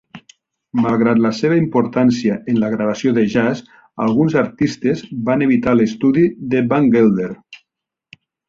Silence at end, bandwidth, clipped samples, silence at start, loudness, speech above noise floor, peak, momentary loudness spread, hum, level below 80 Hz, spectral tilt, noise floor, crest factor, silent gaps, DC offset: 0.95 s; 7.6 kHz; under 0.1%; 0.15 s; -16 LUFS; 66 dB; -2 dBFS; 7 LU; none; -52 dBFS; -7.5 dB/octave; -81 dBFS; 14 dB; none; under 0.1%